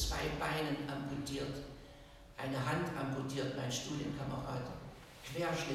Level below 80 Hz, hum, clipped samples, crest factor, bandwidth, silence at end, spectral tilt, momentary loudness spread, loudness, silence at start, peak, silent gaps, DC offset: -52 dBFS; none; under 0.1%; 16 dB; 16 kHz; 0 s; -5 dB/octave; 15 LU; -39 LUFS; 0 s; -24 dBFS; none; under 0.1%